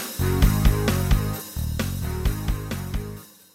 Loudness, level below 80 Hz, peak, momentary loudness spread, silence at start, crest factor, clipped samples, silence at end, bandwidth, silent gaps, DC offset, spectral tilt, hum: -25 LUFS; -26 dBFS; -6 dBFS; 11 LU; 0 s; 18 dB; under 0.1%; 0.3 s; 16.5 kHz; none; under 0.1%; -5.5 dB/octave; none